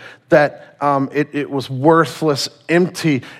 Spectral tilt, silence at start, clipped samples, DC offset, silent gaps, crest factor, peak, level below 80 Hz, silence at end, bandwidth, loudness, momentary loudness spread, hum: -5.5 dB/octave; 0 s; under 0.1%; under 0.1%; none; 16 dB; 0 dBFS; -58 dBFS; 0 s; 15 kHz; -17 LUFS; 8 LU; none